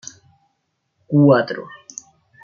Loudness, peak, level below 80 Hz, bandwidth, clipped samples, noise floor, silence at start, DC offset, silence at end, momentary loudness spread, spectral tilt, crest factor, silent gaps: -16 LUFS; -2 dBFS; -66 dBFS; 7.2 kHz; under 0.1%; -71 dBFS; 1.1 s; under 0.1%; 0.8 s; 23 LU; -7 dB/octave; 18 dB; none